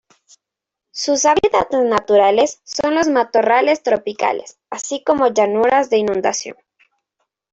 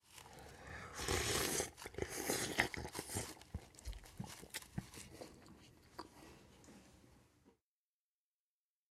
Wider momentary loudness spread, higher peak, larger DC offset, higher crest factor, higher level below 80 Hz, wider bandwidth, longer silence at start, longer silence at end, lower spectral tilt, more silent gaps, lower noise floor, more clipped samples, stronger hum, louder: second, 11 LU vs 24 LU; first, -2 dBFS vs -14 dBFS; neither; second, 16 dB vs 32 dB; about the same, -56 dBFS vs -60 dBFS; second, 8.2 kHz vs 16 kHz; first, 0.95 s vs 0.05 s; second, 1 s vs 1.4 s; about the same, -3 dB/octave vs -2.5 dB/octave; neither; second, -84 dBFS vs under -90 dBFS; neither; neither; first, -16 LUFS vs -42 LUFS